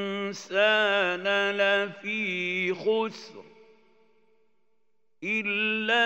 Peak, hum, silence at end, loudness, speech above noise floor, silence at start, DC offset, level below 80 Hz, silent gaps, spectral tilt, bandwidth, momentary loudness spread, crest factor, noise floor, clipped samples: -10 dBFS; none; 0 s; -26 LUFS; 52 dB; 0 s; under 0.1%; -90 dBFS; none; -4 dB/octave; 15.5 kHz; 11 LU; 18 dB; -78 dBFS; under 0.1%